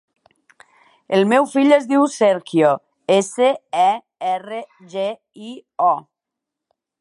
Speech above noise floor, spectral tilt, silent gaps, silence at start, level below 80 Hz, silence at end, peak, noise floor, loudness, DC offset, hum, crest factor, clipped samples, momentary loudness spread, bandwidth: 66 dB; -5 dB/octave; none; 1.1 s; -76 dBFS; 1 s; -2 dBFS; -83 dBFS; -18 LUFS; under 0.1%; none; 18 dB; under 0.1%; 16 LU; 11.5 kHz